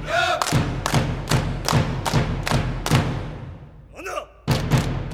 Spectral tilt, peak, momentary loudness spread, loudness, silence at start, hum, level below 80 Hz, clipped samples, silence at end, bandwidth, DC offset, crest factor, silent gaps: -5 dB/octave; 0 dBFS; 14 LU; -23 LUFS; 0 s; none; -34 dBFS; under 0.1%; 0 s; 17 kHz; under 0.1%; 22 dB; none